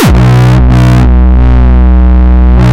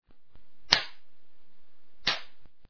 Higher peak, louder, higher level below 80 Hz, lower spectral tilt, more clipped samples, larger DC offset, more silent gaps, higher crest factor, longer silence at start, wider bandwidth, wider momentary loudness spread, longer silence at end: about the same, 0 dBFS vs 0 dBFS; first, -6 LUFS vs -27 LUFS; first, -4 dBFS vs -60 dBFS; first, -7.5 dB/octave vs -1 dB/octave; neither; second, under 0.1% vs 1%; neither; second, 4 dB vs 34 dB; about the same, 0 s vs 0 s; first, 9.4 kHz vs 5.4 kHz; second, 1 LU vs 11 LU; about the same, 0 s vs 0 s